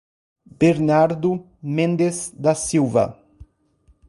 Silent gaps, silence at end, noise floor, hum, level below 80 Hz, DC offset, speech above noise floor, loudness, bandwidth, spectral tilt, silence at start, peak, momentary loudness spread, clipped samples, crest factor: none; 0.95 s; -58 dBFS; none; -52 dBFS; under 0.1%; 39 dB; -20 LUFS; 11.5 kHz; -6 dB/octave; 0.6 s; -4 dBFS; 8 LU; under 0.1%; 18 dB